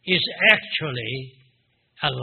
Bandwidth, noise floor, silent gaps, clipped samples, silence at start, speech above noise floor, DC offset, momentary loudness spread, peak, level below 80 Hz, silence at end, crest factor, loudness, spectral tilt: 4.8 kHz; -66 dBFS; none; under 0.1%; 0.05 s; 44 dB; under 0.1%; 14 LU; 0 dBFS; -60 dBFS; 0 s; 24 dB; -20 LUFS; -1.5 dB/octave